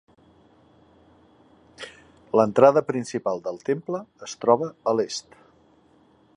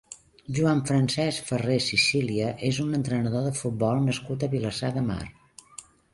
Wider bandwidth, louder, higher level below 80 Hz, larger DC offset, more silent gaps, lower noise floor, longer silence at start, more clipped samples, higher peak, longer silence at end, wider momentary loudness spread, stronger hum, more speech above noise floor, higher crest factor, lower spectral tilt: about the same, 10.5 kHz vs 11.5 kHz; first, -23 LUFS vs -26 LUFS; second, -68 dBFS vs -54 dBFS; neither; neither; first, -58 dBFS vs -49 dBFS; first, 1.8 s vs 0.1 s; neither; first, -2 dBFS vs -10 dBFS; first, 1.15 s vs 0.3 s; about the same, 22 LU vs 20 LU; neither; first, 36 dB vs 23 dB; first, 24 dB vs 16 dB; about the same, -5.5 dB/octave vs -5 dB/octave